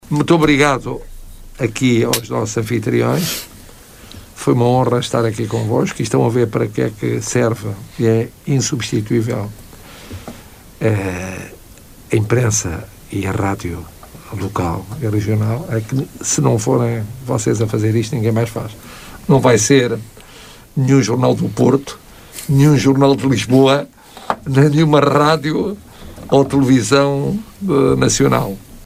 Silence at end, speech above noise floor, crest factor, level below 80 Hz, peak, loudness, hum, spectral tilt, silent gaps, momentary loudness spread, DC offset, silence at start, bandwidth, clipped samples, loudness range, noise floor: 0 s; 25 dB; 16 dB; -40 dBFS; 0 dBFS; -16 LUFS; none; -5.5 dB/octave; none; 17 LU; under 0.1%; 0.05 s; 16 kHz; under 0.1%; 6 LU; -40 dBFS